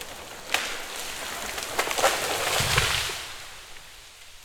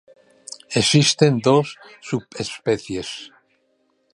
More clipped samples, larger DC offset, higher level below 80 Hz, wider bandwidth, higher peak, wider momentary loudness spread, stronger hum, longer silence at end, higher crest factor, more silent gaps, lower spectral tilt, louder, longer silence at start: neither; neither; first, -46 dBFS vs -56 dBFS; first, 19.5 kHz vs 11.5 kHz; about the same, -2 dBFS vs -2 dBFS; about the same, 21 LU vs 20 LU; neither; second, 0 s vs 0.85 s; first, 26 dB vs 20 dB; neither; second, -1.5 dB/octave vs -4.5 dB/octave; second, -26 LUFS vs -19 LUFS; second, 0 s vs 0.7 s